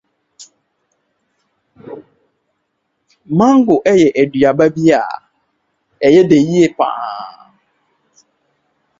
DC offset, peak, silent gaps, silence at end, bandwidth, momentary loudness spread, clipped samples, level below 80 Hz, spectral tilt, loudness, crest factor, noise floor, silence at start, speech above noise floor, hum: under 0.1%; 0 dBFS; none; 1.7 s; 7.8 kHz; 23 LU; under 0.1%; -54 dBFS; -6.5 dB/octave; -12 LUFS; 16 dB; -69 dBFS; 0.4 s; 58 dB; none